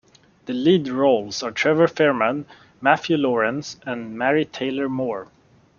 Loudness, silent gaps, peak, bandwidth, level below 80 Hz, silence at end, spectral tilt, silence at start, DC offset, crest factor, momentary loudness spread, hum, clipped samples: -21 LUFS; none; -2 dBFS; 7.2 kHz; -64 dBFS; 0.55 s; -5.5 dB/octave; 0.45 s; under 0.1%; 20 dB; 12 LU; none; under 0.1%